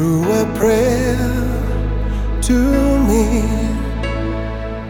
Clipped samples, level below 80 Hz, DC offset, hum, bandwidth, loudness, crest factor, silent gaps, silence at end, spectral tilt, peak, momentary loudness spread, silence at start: under 0.1%; -22 dBFS; under 0.1%; none; 18 kHz; -17 LUFS; 14 dB; none; 0 s; -6.5 dB/octave; -2 dBFS; 8 LU; 0 s